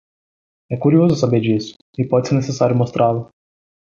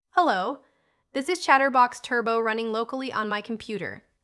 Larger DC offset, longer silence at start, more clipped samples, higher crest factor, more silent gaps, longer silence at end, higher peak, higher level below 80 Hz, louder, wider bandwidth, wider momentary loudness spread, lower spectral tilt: neither; first, 0.7 s vs 0.15 s; neither; about the same, 16 dB vs 20 dB; first, 1.76-1.93 s vs none; first, 0.75 s vs 0.25 s; about the same, -2 dBFS vs -4 dBFS; first, -54 dBFS vs -70 dBFS; first, -17 LUFS vs -25 LUFS; second, 7.6 kHz vs 12 kHz; about the same, 11 LU vs 13 LU; first, -7.5 dB/octave vs -3.5 dB/octave